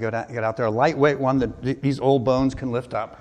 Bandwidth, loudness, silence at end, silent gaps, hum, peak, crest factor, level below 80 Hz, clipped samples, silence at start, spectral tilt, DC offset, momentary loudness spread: 9.4 kHz; -22 LUFS; 0.05 s; none; none; -6 dBFS; 16 dB; -46 dBFS; under 0.1%; 0 s; -7.5 dB/octave; under 0.1%; 8 LU